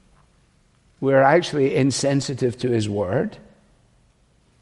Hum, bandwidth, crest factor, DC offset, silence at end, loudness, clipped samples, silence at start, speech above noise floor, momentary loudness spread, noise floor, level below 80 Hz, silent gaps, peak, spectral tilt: none; 11.5 kHz; 20 dB; under 0.1%; 1.25 s; -20 LUFS; under 0.1%; 1 s; 40 dB; 9 LU; -59 dBFS; -56 dBFS; none; -2 dBFS; -5.5 dB/octave